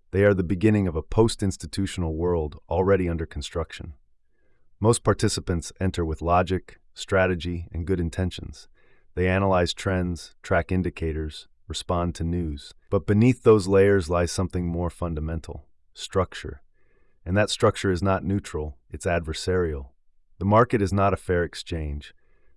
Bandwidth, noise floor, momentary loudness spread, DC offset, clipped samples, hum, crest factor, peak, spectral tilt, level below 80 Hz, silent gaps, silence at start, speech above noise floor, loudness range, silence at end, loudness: 12 kHz; -59 dBFS; 15 LU; under 0.1%; under 0.1%; none; 18 dB; -6 dBFS; -6 dB/octave; -42 dBFS; none; 0.15 s; 35 dB; 5 LU; 0.45 s; -25 LUFS